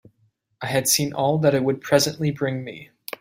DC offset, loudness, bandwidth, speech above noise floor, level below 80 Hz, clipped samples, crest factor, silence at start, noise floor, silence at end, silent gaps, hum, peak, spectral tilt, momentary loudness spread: under 0.1%; -21 LUFS; 16.5 kHz; 44 dB; -60 dBFS; under 0.1%; 20 dB; 0.6 s; -66 dBFS; 0.35 s; none; none; -4 dBFS; -4 dB/octave; 16 LU